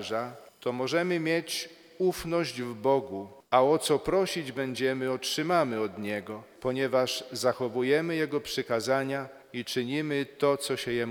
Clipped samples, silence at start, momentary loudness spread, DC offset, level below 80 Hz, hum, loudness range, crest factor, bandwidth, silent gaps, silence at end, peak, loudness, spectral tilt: under 0.1%; 0 s; 9 LU; under 0.1%; -62 dBFS; none; 2 LU; 20 dB; 19.5 kHz; none; 0 s; -8 dBFS; -29 LUFS; -4.5 dB/octave